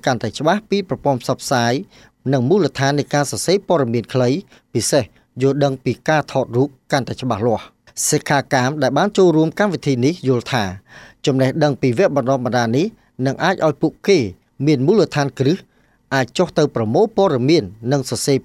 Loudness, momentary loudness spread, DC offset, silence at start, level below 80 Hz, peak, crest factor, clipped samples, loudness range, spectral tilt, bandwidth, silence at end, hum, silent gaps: -18 LUFS; 6 LU; under 0.1%; 0.05 s; -56 dBFS; -2 dBFS; 16 dB; under 0.1%; 2 LU; -5.5 dB/octave; 15 kHz; 0.05 s; none; none